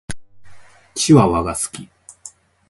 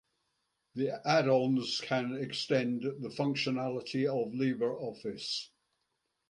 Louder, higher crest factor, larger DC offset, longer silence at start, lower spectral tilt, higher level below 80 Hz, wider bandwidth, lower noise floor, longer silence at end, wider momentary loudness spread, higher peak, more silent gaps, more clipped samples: first, -16 LUFS vs -33 LUFS; about the same, 20 dB vs 20 dB; neither; second, 0.1 s vs 0.75 s; about the same, -5.5 dB/octave vs -5.5 dB/octave; first, -42 dBFS vs -76 dBFS; about the same, 12 kHz vs 11 kHz; second, -43 dBFS vs -82 dBFS; second, 0.4 s vs 0.85 s; first, 26 LU vs 10 LU; first, 0 dBFS vs -14 dBFS; neither; neither